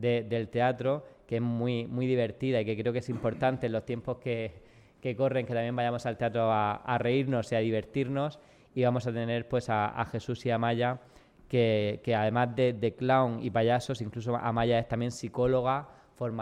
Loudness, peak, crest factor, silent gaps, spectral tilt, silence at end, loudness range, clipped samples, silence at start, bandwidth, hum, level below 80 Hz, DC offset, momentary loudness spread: -30 LUFS; -14 dBFS; 16 dB; none; -7 dB/octave; 0 s; 3 LU; under 0.1%; 0 s; 10.5 kHz; none; -58 dBFS; under 0.1%; 7 LU